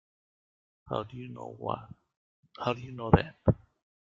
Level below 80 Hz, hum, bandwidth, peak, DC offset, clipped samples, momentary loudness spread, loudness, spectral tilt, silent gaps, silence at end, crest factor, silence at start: -48 dBFS; none; 7.4 kHz; -2 dBFS; under 0.1%; under 0.1%; 15 LU; -32 LUFS; -9 dB/octave; 2.17-2.43 s; 0.6 s; 30 dB; 0.85 s